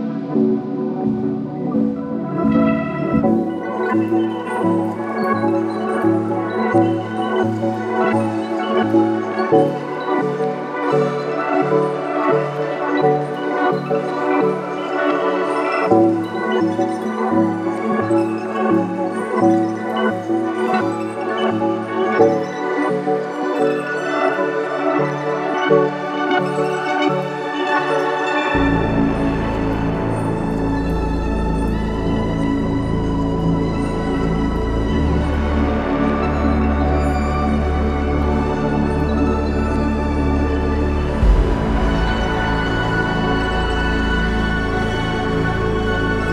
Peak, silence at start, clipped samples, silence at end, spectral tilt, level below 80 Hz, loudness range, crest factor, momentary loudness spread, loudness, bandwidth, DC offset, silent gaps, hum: -2 dBFS; 0 s; under 0.1%; 0 s; -7.5 dB/octave; -26 dBFS; 1 LU; 16 dB; 5 LU; -19 LUFS; 10.5 kHz; under 0.1%; none; none